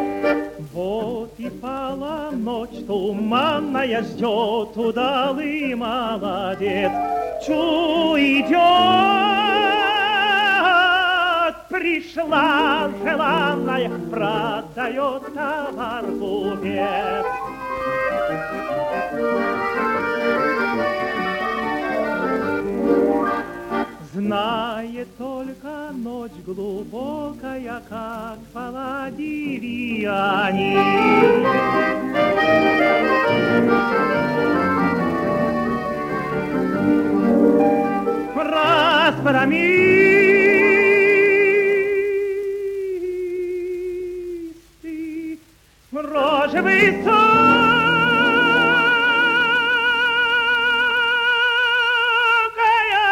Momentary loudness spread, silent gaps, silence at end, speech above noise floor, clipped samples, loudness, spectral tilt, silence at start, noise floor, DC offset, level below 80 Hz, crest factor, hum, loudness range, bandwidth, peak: 15 LU; none; 0 s; 33 dB; under 0.1%; -18 LUFS; -5.5 dB/octave; 0 s; -52 dBFS; under 0.1%; -50 dBFS; 16 dB; none; 12 LU; 16.5 kHz; -2 dBFS